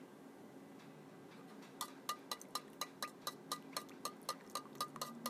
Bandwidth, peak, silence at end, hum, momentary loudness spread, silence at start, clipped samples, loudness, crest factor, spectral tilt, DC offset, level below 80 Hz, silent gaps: 16 kHz; -26 dBFS; 0 s; none; 12 LU; 0 s; under 0.1%; -48 LUFS; 24 dB; -2 dB/octave; under 0.1%; under -90 dBFS; none